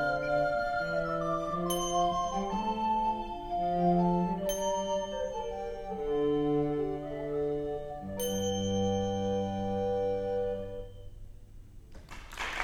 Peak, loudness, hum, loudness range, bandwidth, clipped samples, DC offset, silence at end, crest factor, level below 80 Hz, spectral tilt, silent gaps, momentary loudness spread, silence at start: -16 dBFS; -32 LUFS; none; 3 LU; 19 kHz; under 0.1%; under 0.1%; 0 s; 16 dB; -48 dBFS; -5.5 dB/octave; none; 9 LU; 0 s